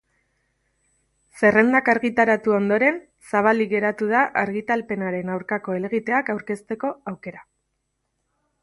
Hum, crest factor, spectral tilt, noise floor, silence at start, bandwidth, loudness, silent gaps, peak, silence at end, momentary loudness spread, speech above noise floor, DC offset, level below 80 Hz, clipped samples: none; 20 dB; -7 dB/octave; -75 dBFS; 1.35 s; 11.5 kHz; -21 LUFS; none; -2 dBFS; 1.2 s; 11 LU; 54 dB; under 0.1%; -64 dBFS; under 0.1%